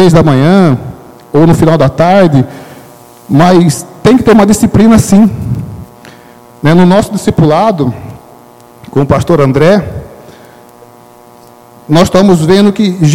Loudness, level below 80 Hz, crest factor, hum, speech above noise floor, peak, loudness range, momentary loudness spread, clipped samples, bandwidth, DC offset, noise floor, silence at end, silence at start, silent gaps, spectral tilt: -7 LUFS; -32 dBFS; 8 dB; none; 31 dB; 0 dBFS; 5 LU; 13 LU; 4%; 16.5 kHz; 1%; -36 dBFS; 0 s; 0 s; none; -6.5 dB/octave